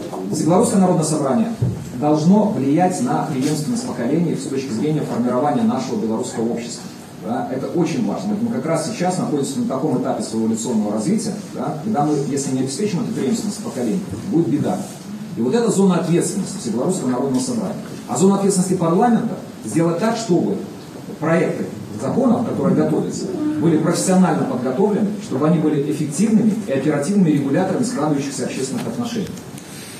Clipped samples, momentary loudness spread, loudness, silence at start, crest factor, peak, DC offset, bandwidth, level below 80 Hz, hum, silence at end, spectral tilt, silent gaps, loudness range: under 0.1%; 9 LU; -19 LUFS; 0 s; 16 dB; -4 dBFS; under 0.1%; 14 kHz; -58 dBFS; none; 0 s; -6 dB/octave; none; 4 LU